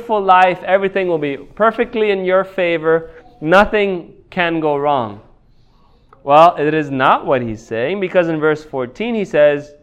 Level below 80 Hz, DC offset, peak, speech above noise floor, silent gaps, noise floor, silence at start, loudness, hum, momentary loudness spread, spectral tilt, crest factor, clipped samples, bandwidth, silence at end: -44 dBFS; under 0.1%; 0 dBFS; 35 dB; none; -50 dBFS; 0 s; -15 LUFS; none; 10 LU; -6.5 dB/octave; 16 dB; 0.1%; 9.4 kHz; 0.15 s